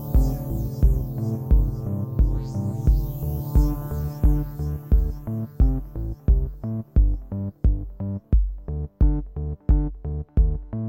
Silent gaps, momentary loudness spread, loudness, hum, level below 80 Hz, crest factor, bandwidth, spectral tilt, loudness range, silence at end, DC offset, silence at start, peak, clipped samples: none; 8 LU; -25 LUFS; none; -22 dBFS; 16 dB; 16 kHz; -9.5 dB/octave; 2 LU; 0 s; under 0.1%; 0 s; -6 dBFS; under 0.1%